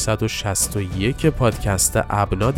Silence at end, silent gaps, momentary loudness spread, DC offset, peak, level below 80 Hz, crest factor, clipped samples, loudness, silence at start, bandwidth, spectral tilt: 0 s; none; 4 LU; under 0.1%; -2 dBFS; -32 dBFS; 16 dB; under 0.1%; -20 LUFS; 0 s; 17.5 kHz; -4.5 dB/octave